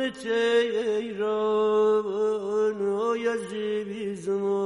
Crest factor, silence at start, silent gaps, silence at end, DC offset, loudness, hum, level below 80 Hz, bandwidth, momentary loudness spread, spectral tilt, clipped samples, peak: 12 dB; 0 s; none; 0 s; under 0.1%; -26 LUFS; none; -72 dBFS; 11.5 kHz; 7 LU; -5 dB/octave; under 0.1%; -14 dBFS